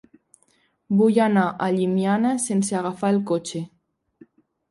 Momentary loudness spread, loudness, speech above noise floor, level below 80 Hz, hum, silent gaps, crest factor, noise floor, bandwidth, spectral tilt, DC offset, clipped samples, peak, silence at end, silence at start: 8 LU; -21 LUFS; 44 dB; -68 dBFS; none; none; 16 dB; -65 dBFS; 11.5 kHz; -6 dB/octave; under 0.1%; under 0.1%; -6 dBFS; 1.05 s; 0.9 s